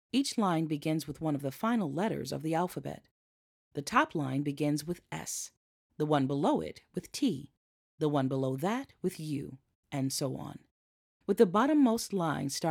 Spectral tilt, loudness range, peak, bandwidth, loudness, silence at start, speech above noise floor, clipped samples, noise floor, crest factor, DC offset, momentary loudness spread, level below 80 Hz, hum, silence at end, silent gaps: -5.5 dB/octave; 4 LU; -10 dBFS; 17.5 kHz; -32 LUFS; 0.15 s; over 59 dB; under 0.1%; under -90 dBFS; 22 dB; under 0.1%; 14 LU; -68 dBFS; none; 0 s; 3.11-3.71 s, 5.57-5.90 s, 7.57-7.98 s, 9.75-9.83 s, 10.71-11.20 s